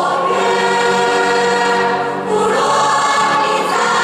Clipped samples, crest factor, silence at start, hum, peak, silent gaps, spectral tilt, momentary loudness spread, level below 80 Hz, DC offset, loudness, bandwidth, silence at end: under 0.1%; 12 dB; 0 s; none; -2 dBFS; none; -3 dB/octave; 3 LU; -58 dBFS; under 0.1%; -14 LUFS; 14.5 kHz; 0 s